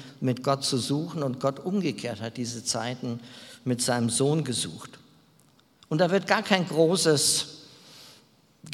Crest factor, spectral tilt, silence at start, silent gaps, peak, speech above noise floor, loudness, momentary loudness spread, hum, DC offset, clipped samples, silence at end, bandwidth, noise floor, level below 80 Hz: 26 dB; -4 dB/octave; 0 s; none; -2 dBFS; 34 dB; -26 LUFS; 14 LU; none; under 0.1%; under 0.1%; 0 s; 16.5 kHz; -61 dBFS; -70 dBFS